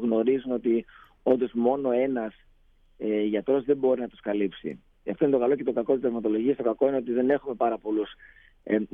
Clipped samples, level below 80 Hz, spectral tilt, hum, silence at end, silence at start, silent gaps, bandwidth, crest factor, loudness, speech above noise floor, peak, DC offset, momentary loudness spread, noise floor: under 0.1%; -60 dBFS; -10 dB/octave; none; 0.1 s; 0 s; none; 3.7 kHz; 16 dB; -26 LUFS; 33 dB; -10 dBFS; under 0.1%; 8 LU; -59 dBFS